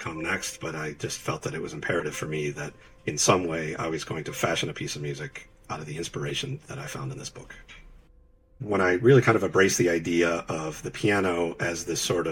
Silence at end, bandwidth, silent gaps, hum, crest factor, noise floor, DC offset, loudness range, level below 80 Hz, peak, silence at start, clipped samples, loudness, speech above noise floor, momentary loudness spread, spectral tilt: 0 s; 17 kHz; none; none; 20 dB; -57 dBFS; under 0.1%; 11 LU; -54 dBFS; -6 dBFS; 0 s; under 0.1%; -27 LUFS; 30 dB; 16 LU; -4.5 dB/octave